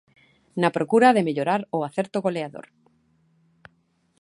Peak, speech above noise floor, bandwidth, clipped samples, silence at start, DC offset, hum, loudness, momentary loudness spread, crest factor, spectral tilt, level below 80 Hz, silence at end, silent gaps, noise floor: -4 dBFS; 44 dB; 11.5 kHz; under 0.1%; 0.55 s; under 0.1%; none; -22 LUFS; 17 LU; 20 dB; -6.5 dB/octave; -72 dBFS; 1.6 s; none; -66 dBFS